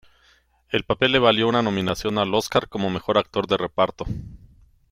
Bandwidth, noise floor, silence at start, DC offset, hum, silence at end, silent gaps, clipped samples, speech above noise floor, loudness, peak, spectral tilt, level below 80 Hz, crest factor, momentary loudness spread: 16.5 kHz; -60 dBFS; 0.7 s; under 0.1%; none; 0.55 s; none; under 0.1%; 38 dB; -22 LUFS; -4 dBFS; -5 dB/octave; -46 dBFS; 20 dB; 10 LU